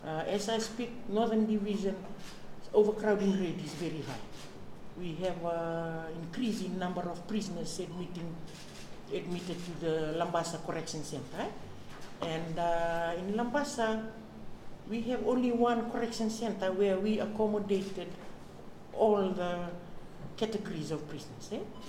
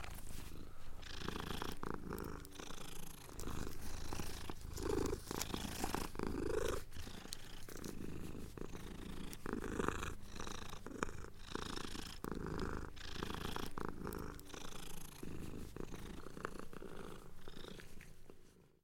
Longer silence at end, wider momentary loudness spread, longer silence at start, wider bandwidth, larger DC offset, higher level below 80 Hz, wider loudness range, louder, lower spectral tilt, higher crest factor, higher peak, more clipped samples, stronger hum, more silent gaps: second, 0 s vs 0.15 s; first, 19 LU vs 12 LU; about the same, 0 s vs 0 s; about the same, 16 kHz vs 17 kHz; neither; about the same, -54 dBFS vs -50 dBFS; about the same, 6 LU vs 7 LU; first, -34 LUFS vs -47 LUFS; about the same, -5.5 dB/octave vs -4.5 dB/octave; second, 20 dB vs 26 dB; first, -14 dBFS vs -18 dBFS; neither; neither; neither